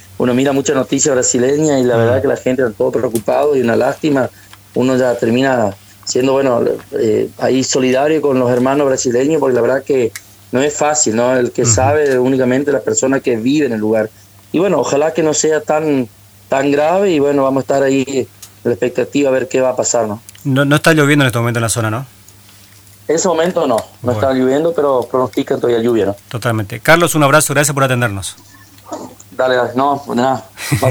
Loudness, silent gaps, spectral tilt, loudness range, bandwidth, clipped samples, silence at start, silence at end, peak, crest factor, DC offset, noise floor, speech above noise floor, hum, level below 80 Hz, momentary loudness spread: -14 LUFS; none; -4.5 dB/octave; 2 LU; over 20 kHz; under 0.1%; 0.1 s; 0 s; 0 dBFS; 14 dB; under 0.1%; -42 dBFS; 28 dB; none; -50 dBFS; 8 LU